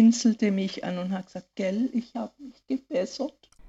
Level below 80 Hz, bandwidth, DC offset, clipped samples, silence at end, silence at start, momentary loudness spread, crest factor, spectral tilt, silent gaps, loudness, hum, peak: -66 dBFS; 8 kHz; under 0.1%; under 0.1%; 0 s; 0 s; 13 LU; 16 dB; -5.5 dB/octave; none; -28 LUFS; none; -10 dBFS